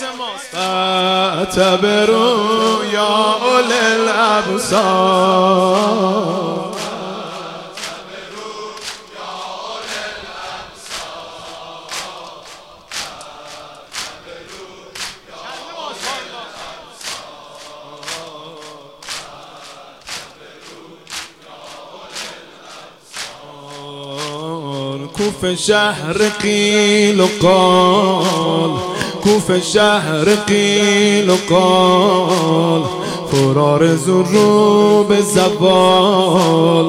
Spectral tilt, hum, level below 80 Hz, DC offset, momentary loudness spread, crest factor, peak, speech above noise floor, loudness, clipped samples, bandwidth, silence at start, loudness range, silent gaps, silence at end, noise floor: -4.5 dB/octave; none; -52 dBFS; 0.1%; 22 LU; 16 dB; 0 dBFS; 26 dB; -14 LUFS; under 0.1%; 16 kHz; 0 s; 18 LU; none; 0 s; -38 dBFS